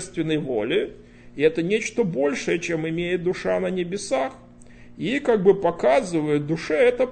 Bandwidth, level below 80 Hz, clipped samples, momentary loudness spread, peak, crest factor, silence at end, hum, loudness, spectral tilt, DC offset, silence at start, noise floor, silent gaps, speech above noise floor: 9.2 kHz; -52 dBFS; under 0.1%; 7 LU; -4 dBFS; 18 dB; 0 s; none; -23 LUFS; -5.5 dB/octave; under 0.1%; 0 s; -45 dBFS; none; 23 dB